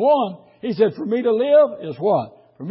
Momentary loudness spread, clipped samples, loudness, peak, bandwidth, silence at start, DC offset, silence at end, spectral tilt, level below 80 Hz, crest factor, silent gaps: 15 LU; under 0.1%; -19 LUFS; -4 dBFS; 5.8 kHz; 0 s; under 0.1%; 0 s; -11.5 dB/octave; -70 dBFS; 14 dB; none